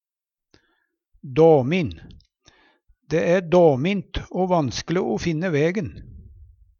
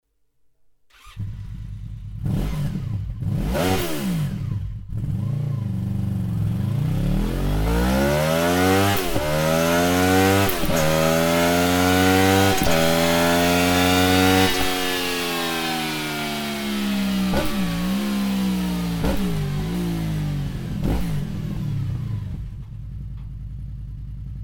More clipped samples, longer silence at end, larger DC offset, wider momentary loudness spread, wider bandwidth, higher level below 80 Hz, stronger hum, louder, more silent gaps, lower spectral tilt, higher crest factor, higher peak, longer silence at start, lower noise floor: neither; first, 0.55 s vs 0 s; neither; second, 12 LU vs 18 LU; second, 7.2 kHz vs over 20 kHz; second, -46 dBFS vs -34 dBFS; neither; about the same, -21 LUFS vs -21 LUFS; neither; first, -6.5 dB/octave vs -5 dB/octave; about the same, 18 dB vs 20 dB; about the same, -4 dBFS vs -2 dBFS; first, 1.25 s vs 1.05 s; first, -89 dBFS vs -61 dBFS